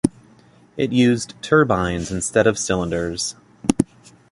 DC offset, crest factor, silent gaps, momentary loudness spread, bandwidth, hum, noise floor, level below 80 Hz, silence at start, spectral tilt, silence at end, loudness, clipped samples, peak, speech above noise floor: under 0.1%; 20 dB; none; 9 LU; 11.5 kHz; none; -51 dBFS; -44 dBFS; 0.05 s; -5 dB/octave; 0.5 s; -20 LUFS; under 0.1%; 0 dBFS; 32 dB